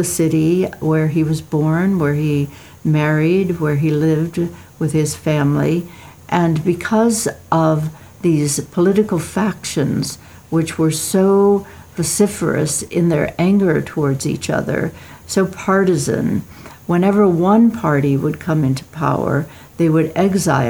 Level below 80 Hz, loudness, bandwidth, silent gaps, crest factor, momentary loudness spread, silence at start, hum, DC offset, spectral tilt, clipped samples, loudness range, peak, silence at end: -48 dBFS; -17 LUFS; over 20 kHz; none; 16 dB; 8 LU; 0 s; none; 0.1%; -6 dB/octave; under 0.1%; 2 LU; 0 dBFS; 0 s